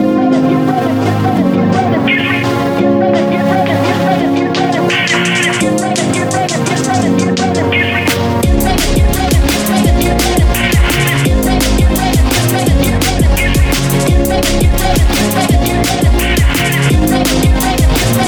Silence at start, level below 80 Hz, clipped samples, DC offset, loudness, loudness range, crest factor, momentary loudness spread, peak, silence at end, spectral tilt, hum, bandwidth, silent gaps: 0 s; -18 dBFS; under 0.1%; under 0.1%; -11 LUFS; 1 LU; 10 dB; 2 LU; 0 dBFS; 0 s; -5 dB/octave; none; over 20 kHz; none